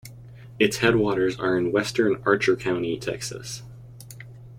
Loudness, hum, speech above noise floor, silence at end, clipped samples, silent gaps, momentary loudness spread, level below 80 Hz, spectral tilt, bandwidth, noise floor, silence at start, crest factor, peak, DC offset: -23 LUFS; none; 20 dB; 0 s; under 0.1%; none; 22 LU; -52 dBFS; -5 dB/octave; 16 kHz; -43 dBFS; 0.05 s; 20 dB; -4 dBFS; under 0.1%